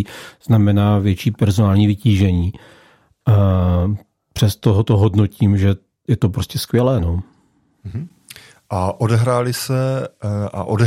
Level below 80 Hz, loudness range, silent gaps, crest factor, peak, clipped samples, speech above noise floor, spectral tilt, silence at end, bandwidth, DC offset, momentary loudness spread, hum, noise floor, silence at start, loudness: -44 dBFS; 5 LU; none; 16 dB; -2 dBFS; under 0.1%; 43 dB; -7.5 dB/octave; 0 s; 16 kHz; under 0.1%; 13 LU; none; -59 dBFS; 0 s; -17 LUFS